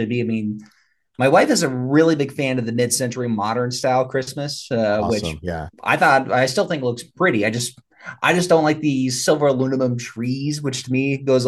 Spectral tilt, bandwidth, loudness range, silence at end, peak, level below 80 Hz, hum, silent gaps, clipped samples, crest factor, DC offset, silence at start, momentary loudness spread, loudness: -5 dB/octave; 12.5 kHz; 2 LU; 0 s; -2 dBFS; -52 dBFS; none; none; under 0.1%; 18 dB; under 0.1%; 0 s; 11 LU; -20 LUFS